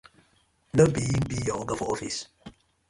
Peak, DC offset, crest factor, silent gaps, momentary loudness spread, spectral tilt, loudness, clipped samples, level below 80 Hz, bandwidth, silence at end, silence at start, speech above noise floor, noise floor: -6 dBFS; under 0.1%; 22 dB; none; 12 LU; -5.5 dB/octave; -27 LUFS; under 0.1%; -48 dBFS; 11.5 kHz; 0.4 s; 0.75 s; 40 dB; -66 dBFS